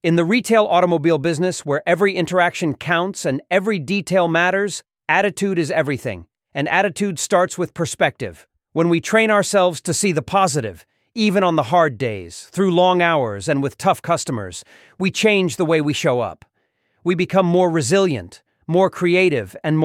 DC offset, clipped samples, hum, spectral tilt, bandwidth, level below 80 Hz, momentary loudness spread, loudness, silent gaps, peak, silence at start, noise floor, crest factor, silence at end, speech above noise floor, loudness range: under 0.1%; under 0.1%; none; -5 dB/octave; 16 kHz; -58 dBFS; 10 LU; -18 LUFS; none; -2 dBFS; 0.05 s; -68 dBFS; 16 dB; 0 s; 50 dB; 2 LU